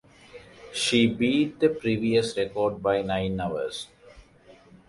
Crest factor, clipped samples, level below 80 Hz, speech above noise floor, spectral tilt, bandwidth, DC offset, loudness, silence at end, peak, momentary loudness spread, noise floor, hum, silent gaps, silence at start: 18 dB; under 0.1%; -54 dBFS; 29 dB; -5 dB/octave; 11.5 kHz; under 0.1%; -25 LUFS; 0.35 s; -10 dBFS; 13 LU; -54 dBFS; none; none; 0.35 s